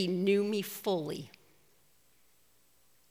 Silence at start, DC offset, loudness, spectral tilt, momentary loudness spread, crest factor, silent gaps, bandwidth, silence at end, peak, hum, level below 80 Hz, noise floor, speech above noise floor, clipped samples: 0 s; under 0.1%; -32 LUFS; -5.5 dB/octave; 14 LU; 18 dB; none; 16.5 kHz; 1.8 s; -18 dBFS; none; -80 dBFS; -69 dBFS; 37 dB; under 0.1%